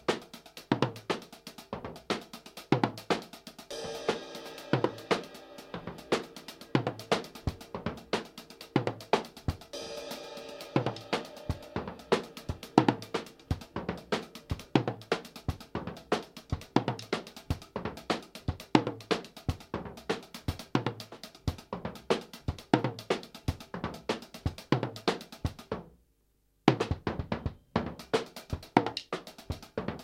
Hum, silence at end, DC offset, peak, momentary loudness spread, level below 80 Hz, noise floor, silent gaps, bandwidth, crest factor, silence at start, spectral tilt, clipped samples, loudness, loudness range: none; 0 s; under 0.1%; -2 dBFS; 13 LU; -50 dBFS; -71 dBFS; none; 16.5 kHz; 32 dB; 0.1 s; -5.5 dB/octave; under 0.1%; -34 LUFS; 3 LU